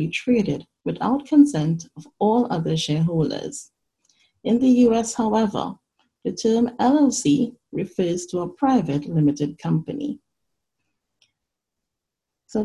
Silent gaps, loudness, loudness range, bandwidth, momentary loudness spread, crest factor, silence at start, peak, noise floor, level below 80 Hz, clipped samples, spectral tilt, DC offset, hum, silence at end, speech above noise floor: none; -21 LUFS; 5 LU; 11.5 kHz; 14 LU; 18 dB; 0 s; -4 dBFS; -84 dBFS; -58 dBFS; under 0.1%; -6 dB/octave; under 0.1%; none; 0 s; 63 dB